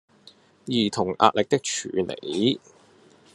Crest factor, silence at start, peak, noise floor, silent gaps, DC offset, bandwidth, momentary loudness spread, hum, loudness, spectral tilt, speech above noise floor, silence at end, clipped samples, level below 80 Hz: 24 dB; 0.65 s; -2 dBFS; -55 dBFS; none; under 0.1%; 11.5 kHz; 8 LU; none; -24 LUFS; -4 dB/octave; 31 dB; 0.75 s; under 0.1%; -66 dBFS